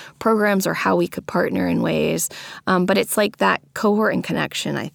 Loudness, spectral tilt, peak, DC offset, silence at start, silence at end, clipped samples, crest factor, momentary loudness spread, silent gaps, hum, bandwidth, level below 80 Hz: -20 LUFS; -4.5 dB/octave; -4 dBFS; under 0.1%; 0 s; 0.05 s; under 0.1%; 16 dB; 5 LU; none; none; over 20 kHz; -56 dBFS